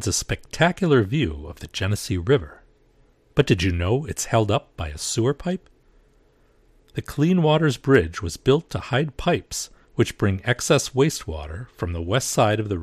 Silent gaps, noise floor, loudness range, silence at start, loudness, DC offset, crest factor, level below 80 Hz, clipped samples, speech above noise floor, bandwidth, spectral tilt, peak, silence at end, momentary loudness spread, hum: none; -58 dBFS; 3 LU; 0 s; -22 LUFS; under 0.1%; 20 dB; -42 dBFS; under 0.1%; 36 dB; 15 kHz; -5 dB/octave; -2 dBFS; 0 s; 12 LU; none